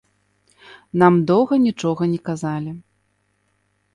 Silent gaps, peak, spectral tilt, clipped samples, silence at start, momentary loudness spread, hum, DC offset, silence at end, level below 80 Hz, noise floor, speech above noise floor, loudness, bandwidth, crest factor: none; -2 dBFS; -7.5 dB/octave; under 0.1%; 0.7 s; 13 LU; 50 Hz at -50 dBFS; under 0.1%; 1.15 s; -60 dBFS; -67 dBFS; 49 dB; -19 LUFS; 11 kHz; 20 dB